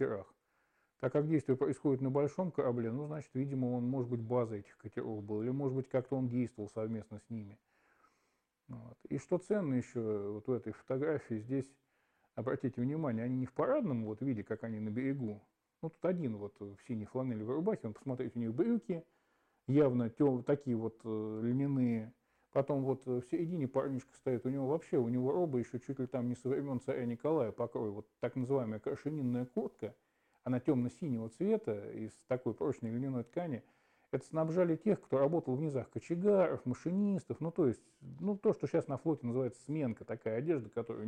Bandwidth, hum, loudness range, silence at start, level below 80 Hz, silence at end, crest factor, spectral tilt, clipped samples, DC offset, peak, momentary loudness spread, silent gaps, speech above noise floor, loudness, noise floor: 9.8 kHz; none; 5 LU; 0 s; -76 dBFS; 0 s; 16 dB; -9 dB/octave; under 0.1%; under 0.1%; -20 dBFS; 10 LU; none; 45 dB; -37 LUFS; -81 dBFS